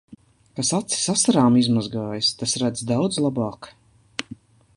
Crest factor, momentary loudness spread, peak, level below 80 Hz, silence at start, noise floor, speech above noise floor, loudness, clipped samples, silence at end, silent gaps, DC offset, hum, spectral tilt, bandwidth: 20 dB; 16 LU; -4 dBFS; -58 dBFS; 0.1 s; -44 dBFS; 23 dB; -21 LUFS; under 0.1%; 0.4 s; none; under 0.1%; none; -4 dB/octave; 11.5 kHz